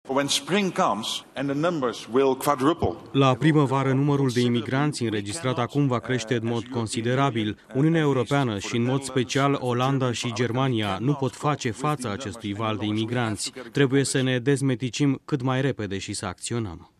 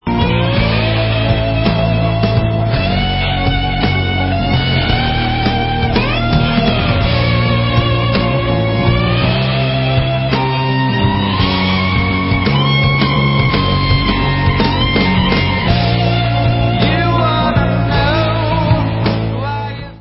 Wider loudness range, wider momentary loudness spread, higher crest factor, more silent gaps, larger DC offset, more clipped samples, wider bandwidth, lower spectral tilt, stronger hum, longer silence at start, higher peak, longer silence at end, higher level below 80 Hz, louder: about the same, 3 LU vs 2 LU; first, 7 LU vs 2 LU; about the same, 18 dB vs 14 dB; neither; neither; neither; first, 13.5 kHz vs 5.8 kHz; second, -5.5 dB/octave vs -10.5 dB/octave; neither; about the same, 0.05 s vs 0.05 s; second, -6 dBFS vs 0 dBFS; about the same, 0.15 s vs 0.05 s; second, -58 dBFS vs -24 dBFS; second, -24 LUFS vs -14 LUFS